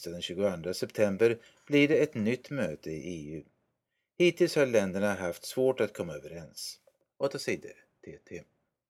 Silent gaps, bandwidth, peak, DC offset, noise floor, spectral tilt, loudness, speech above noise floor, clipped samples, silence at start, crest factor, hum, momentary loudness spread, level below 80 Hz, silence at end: none; 16 kHz; -12 dBFS; under 0.1%; -82 dBFS; -5 dB/octave; -30 LUFS; 52 dB; under 0.1%; 0 s; 20 dB; none; 19 LU; -66 dBFS; 0.45 s